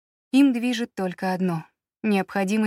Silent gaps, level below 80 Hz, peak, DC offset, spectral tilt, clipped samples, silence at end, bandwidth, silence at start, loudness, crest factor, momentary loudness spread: none; -72 dBFS; -8 dBFS; under 0.1%; -6 dB/octave; under 0.1%; 0 s; 14.5 kHz; 0.35 s; -24 LUFS; 14 dB; 9 LU